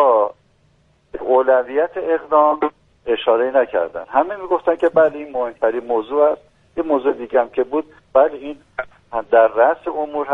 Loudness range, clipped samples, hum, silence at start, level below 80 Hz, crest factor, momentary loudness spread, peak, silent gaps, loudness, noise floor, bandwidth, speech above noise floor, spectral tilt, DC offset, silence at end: 2 LU; under 0.1%; none; 0 s; -56 dBFS; 18 dB; 14 LU; 0 dBFS; none; -18 LUFS; -57 dBFS; 3.9 kHz; 40 dB; -7 dB/octave; under 0.1%; 0 s